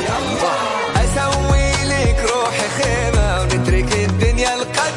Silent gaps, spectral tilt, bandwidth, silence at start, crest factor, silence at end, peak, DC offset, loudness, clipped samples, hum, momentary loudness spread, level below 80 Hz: none; -4.5 dB/octave; 11.5 kHz; 0 s; 12 dB; 0 s; -4 dBFS; under 0.1%; -17 LUFS; under 0.1%; none; 2 LU; -22 dBFS